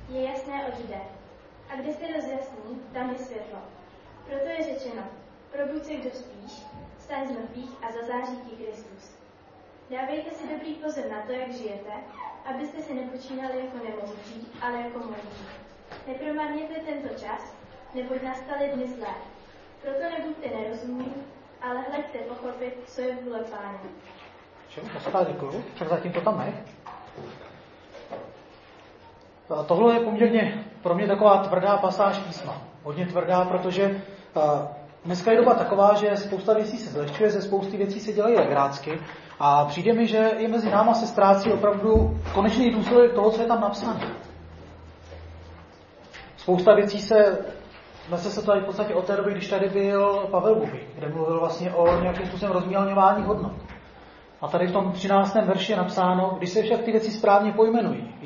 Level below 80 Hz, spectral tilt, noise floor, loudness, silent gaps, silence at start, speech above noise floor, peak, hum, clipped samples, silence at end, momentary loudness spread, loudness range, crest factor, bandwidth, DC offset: -48 dBFS; -6.5 dB/octave; -52 dBFS; -24 LUFS; none; 0 s; 28 dB; -2 dBFS; none; under 0.1%; 0 s; 21 LU; 14 LU; 22 dB; 7.2 kHz; under 0.1%